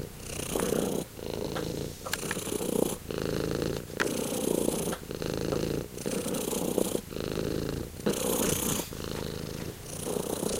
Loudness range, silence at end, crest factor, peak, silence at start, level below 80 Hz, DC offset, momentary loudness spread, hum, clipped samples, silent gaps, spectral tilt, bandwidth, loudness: 2 LU; 0 s; 22 dB; -10 dBFS; 0 s; -48 dBFS; under 0.1%; 7 LU; none; under 0.1%; none; -4 dB/octave; 17 kHz; -32 LUFS